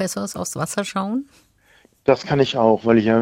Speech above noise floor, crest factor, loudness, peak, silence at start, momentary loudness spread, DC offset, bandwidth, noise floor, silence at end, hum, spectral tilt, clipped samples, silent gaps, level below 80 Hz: 37 dB; 18 dB; -20 LUFS; -2 dBFS; 0 s; 10 LU; under 0.1%; 16 kHz; -56 dBFS; 0 s; none; -5 dB/octave; under 0.1%; none; -54 dBFS